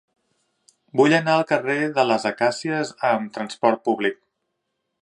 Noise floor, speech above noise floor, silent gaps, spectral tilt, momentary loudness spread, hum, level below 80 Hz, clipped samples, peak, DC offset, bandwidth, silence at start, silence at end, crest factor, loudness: -77 dBFS; 56 dB; none; -5 dB/octave; 8 LU; none; -74 dBFS; under 0.1%; -2 dBFS; under 0.1%; 11.5 kHz; 0.95 s; 0.9 s; 20 dB; -21 LUFS